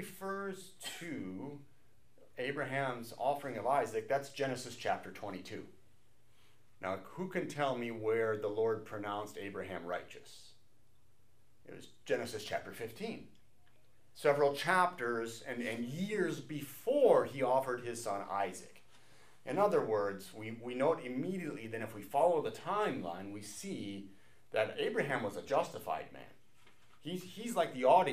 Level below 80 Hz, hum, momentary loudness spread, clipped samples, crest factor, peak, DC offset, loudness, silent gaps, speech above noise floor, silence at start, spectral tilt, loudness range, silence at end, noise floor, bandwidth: -78 dBFS; none; 15 LU; under 0.1%; 22 dB; -14 dBFS; 0.2%; -36 LUFS; none; 36 dB; 0 s; -5 dB/octave; 9 LU; 0 s; -72 dBFS; 15.5 kHz